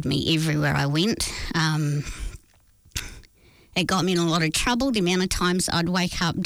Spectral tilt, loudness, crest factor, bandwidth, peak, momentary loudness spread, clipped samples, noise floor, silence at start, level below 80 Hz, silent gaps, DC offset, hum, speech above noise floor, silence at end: -4.5 dB/octave; -23 LUFS; 12 dB; 19.5 kHz; -12 dBFS; 12 LU; under 0.1%; -56 dBFS; 0 s; -40 dBFS; none; under 0.1%; none; 33 dB; 0 s